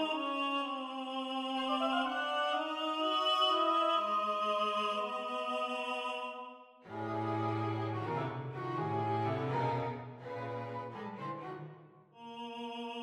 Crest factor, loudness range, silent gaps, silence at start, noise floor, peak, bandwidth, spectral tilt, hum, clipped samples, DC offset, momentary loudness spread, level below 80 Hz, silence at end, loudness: 16 dB; 7 LU; none; 0 s; -57 dBFS; -20 dBFS; 14 kHz; -5.5 dB/octave; none; under 0.1%; under 0.1%; 14 LU; -76 dBFS; 0 s; -35 LUFS